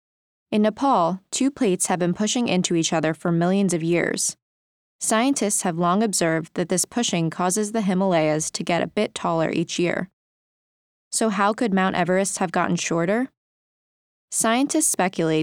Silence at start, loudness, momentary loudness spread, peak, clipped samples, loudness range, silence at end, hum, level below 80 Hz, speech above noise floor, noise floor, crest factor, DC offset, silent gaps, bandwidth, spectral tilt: 0.5 s; -22 LUFS; 4 LU; -6 dBFS; under 0.1%; 2 LU; 0 s; none; -66 dBFS; over 68 dB; under -90 dBFS; 16 dB; under 0.1%; 4.42-4.99 s, 10.13-11.11 s, 13.37-14.28 s; 18.5 kHz; -4 dB/octave